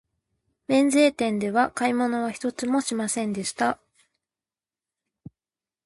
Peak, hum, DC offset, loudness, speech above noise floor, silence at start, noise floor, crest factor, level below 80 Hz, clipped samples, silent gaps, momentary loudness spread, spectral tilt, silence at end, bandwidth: -8 dBFS; none; under 0.1%; -24 LUFS; over 67 dB; 0.7 s; under -90 dBFS; 18 dB; -66 dBFS; under 0.1%; none; 9 LU; -4 dB/octave; 2.1 s; 12 kHz